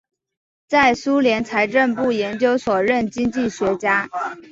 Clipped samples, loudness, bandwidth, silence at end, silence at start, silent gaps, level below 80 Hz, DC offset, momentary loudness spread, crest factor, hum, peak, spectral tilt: under 0.1%; -19 LUFS; 7.8 kHz; 0.1 s; 0.7 s; none; -54 dBFS; under 0.1%; 5 LU; 18 dB; none; -2 dBFS; -5 dB/octave